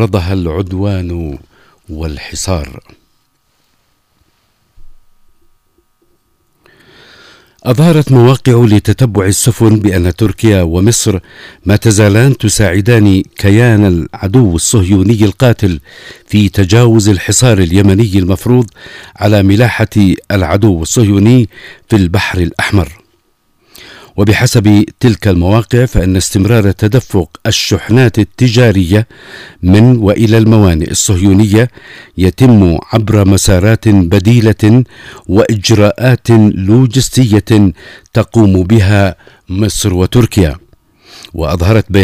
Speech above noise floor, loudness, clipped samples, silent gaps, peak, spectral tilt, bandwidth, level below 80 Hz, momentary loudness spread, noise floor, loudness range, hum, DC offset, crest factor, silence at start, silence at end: 48 dB; -9 LUFS; 0.6%; none; 0 dBFS; -6 dB/octave; 16 kHz; -30 dBFS; 10 LU; -57 dBFS; 5 LU; none; under 0.1%; 10 dB; 0 s; 0 s